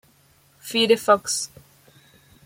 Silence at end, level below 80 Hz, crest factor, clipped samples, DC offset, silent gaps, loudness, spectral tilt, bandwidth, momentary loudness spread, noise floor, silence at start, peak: 1 s; -66 dBFS; 20 dB; under 0.1%; under 0.1%; none; -20 LUFS; -2 dB/octave; 16.5 kHz; 16 LU; -58 dBFS; 0.65 s; -4 dBFS